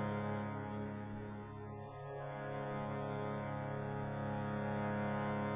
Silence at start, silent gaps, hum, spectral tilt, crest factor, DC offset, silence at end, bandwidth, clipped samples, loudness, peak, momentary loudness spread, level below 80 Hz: 0 s; none; none; -7 dB/octave; 14 dB; under 0.1%; 0 s; 3.8 kHz; under 0.1%; -42 LUFS; -26 dBFS; 9 LU; -64 dBFS